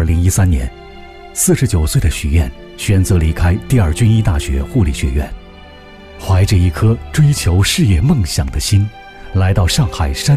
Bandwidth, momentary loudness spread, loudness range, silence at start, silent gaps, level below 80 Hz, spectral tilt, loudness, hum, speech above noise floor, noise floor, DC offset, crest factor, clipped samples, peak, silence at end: 15.5 kHz; 9 LU; 2 LU; 0 s; none; -22 dBFS; -5.5 dB/octave; -14 LUFS; none; 24 dB; -36 dBFS; under 0.1%; 12 dB; under 0.1%; -2 dBFS; 0 s